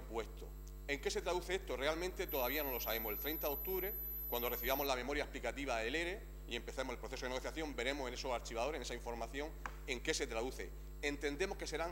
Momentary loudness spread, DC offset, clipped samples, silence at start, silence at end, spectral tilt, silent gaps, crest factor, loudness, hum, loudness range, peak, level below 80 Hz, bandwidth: 8 LU; under 0.1%; under 0.1%; 0 s; 0 s; -3.5 dB/octave; none; 20 dB; -41 LUFS; none; 4 LU; -20 dBFS; -50 dBFS; 16 kHz